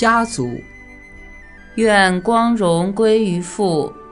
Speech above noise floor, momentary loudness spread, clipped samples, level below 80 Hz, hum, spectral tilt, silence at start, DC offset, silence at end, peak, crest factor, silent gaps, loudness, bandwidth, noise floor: 23 dB; 11 LU; under 0.1%; -44 dBFS; none; -5 dB/octave; 0 s; under 0.1%; 0 s; 0 dBFS; 16 dB; none; -16 LUFS; 11 kHz; -39 dBFS